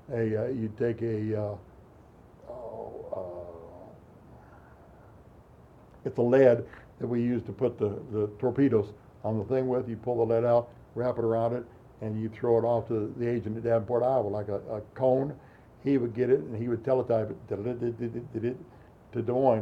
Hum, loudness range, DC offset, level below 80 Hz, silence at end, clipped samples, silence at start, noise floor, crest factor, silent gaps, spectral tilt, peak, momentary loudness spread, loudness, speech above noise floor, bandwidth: none; 15 LU; under 0.1%; -60 dBFS; 0 s; under 0.1%; 0.1 s; -54 dBFS; 20 dB; none; -10 dB/octave; -10 dBFS; 15 LU; -29 LUFS; 26 dB; 7.4 kHz